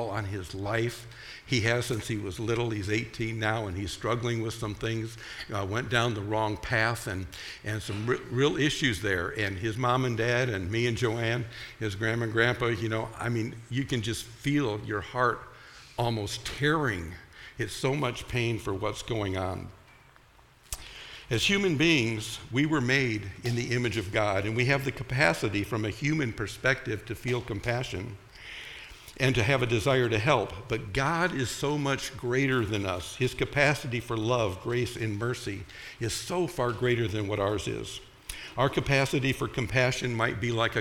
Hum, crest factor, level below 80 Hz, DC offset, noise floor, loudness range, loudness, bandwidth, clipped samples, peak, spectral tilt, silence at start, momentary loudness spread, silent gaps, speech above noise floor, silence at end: none; 22 dB; -50 dBFS; under 0.1%; -58 dBFS; 4 LU; -29 LUFS; 16.5 kHz; under 0.1%; -6 dBFS; -5 dB/octave; 0 s; 12 LU; none; 29 dB; 0 s